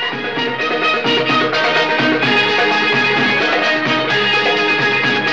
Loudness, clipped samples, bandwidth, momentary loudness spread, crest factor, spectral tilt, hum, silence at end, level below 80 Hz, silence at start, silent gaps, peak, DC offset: -14 LUFS; under 0.1%; 8.8 kHz; 3 LU; 12 dB; -4 dB/octave; none; 0 s; -62 dBFS; 0 s; none; -2 dBFS; 0.7%